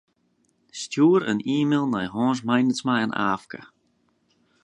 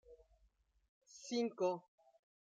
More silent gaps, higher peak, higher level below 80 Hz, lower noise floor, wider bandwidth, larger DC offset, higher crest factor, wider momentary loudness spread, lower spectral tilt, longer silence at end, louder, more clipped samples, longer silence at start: second, none vs 0.89-1.01 s; first, -6 dBFS vs -26 dBFS; first, -66 dBFS vs -78 dBFS; second, -68 dBFS vs -76 dBFS; about the same, 10 kHz vs 9.2 kHz; neither; about the same, 18 dB vs 20 dB; about the same, 16 LU vs 18 LU; about the same, -5.5 dB/octave vs -4.5 dB/octave; first, 1 s vs 0.75 s; first, -23 LUFS vs -41 LUFS; neither; first, 0.75 s vs 0.1 s